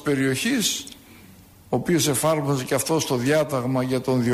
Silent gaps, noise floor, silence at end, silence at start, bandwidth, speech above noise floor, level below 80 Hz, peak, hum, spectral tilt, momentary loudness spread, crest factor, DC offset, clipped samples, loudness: none; -48 dBFS; 0 s; 0 s; 15.5 kHz; 26 dB; -56 dBFS; -10 dBFS; none; -4.5 dB/octave; 5 LU; 14 dB; under 0.1%; under 0.1%; -22 LUFS